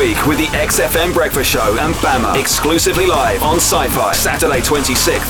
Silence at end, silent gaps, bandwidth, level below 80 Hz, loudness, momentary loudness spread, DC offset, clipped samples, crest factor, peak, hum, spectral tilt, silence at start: 0 s; none; over 20 kHz; -26 dBFS; -13 LUFS; 2 LU; under 0.1%; under 0.1%; 12 dB; -2 dBFS; none; -3 dB/octave; 0 s